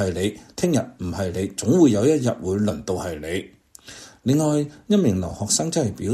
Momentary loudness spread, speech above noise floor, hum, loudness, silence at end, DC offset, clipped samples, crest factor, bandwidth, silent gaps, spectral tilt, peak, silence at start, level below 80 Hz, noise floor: 12 LU; 22 dB; none; -22 LUFS; 0 s; under 0.1%; under 0.1%; 16 dB; 14 kHz; none; -5.5 dB/octave; -4 dBFS; 0 s; -50 dBFS; -44 dBFS